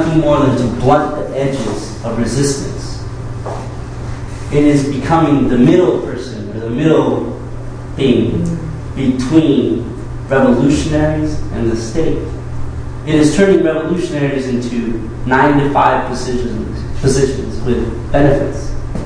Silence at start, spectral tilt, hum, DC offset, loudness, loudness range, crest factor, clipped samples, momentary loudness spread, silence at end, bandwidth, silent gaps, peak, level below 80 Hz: 0 s; -6.5 dB/octave; none; under 0.1%; -15 LUFS; 4 LU; 14 dB; under 0.1%; 14 LU; 0 s; 10.5 kHz; none; 0 dBFS; -26 dBFS